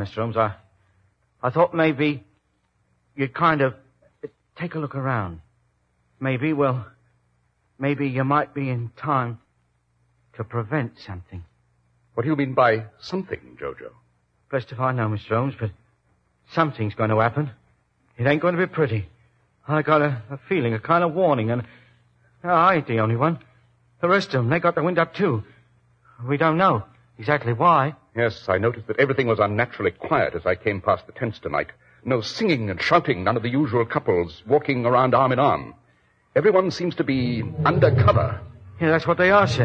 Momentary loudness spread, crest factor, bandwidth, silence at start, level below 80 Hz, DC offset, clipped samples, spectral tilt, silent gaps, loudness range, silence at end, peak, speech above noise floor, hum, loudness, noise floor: 14 LU; 20 dB; 8 kHz; 0 s; -54 dBFS; under 0.1%; under 0.1%; -7.5 dB/octave; none; 7 LU; 0 s; -2 dBFS; 47 dB; 60 Hz at -50 dBFS; -22 LUFS; -68 dBFS